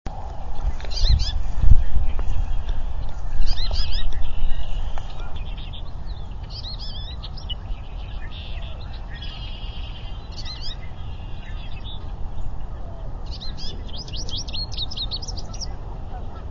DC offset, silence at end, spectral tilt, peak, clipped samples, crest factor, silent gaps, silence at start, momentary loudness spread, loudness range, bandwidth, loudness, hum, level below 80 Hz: under 0.1%; 0 s; -4.5 dB/octave; 0 dBFS; under 0.1%; 18 dB; none; 0.05 s; 10 LU; 9 LU; 6.8 kHz; -30 LUFS; none; -24 dBFS